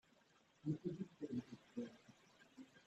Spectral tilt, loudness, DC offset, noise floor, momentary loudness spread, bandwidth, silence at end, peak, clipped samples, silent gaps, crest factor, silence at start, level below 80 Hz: -8 dB/octave; -49 LUFS; under 0.1%; -74 dBFS; 20 LU; 8.4 kHz; 0.05 s; -30 dBFS; under 0.1%; none; 20 dB; 0.65 s; -84 dBFS